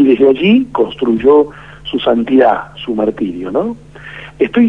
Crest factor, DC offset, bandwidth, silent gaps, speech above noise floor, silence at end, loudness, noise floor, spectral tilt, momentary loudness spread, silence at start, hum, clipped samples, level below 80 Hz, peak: 12 dB; 0.4%; 5.4 kHz; none; 20 dB; 0 s; -13 LUFS; -32 dBFS; -8 dB/octave; 18 LU; 0 s; none; under 0.1%; -44 dBFS; 0 dBFS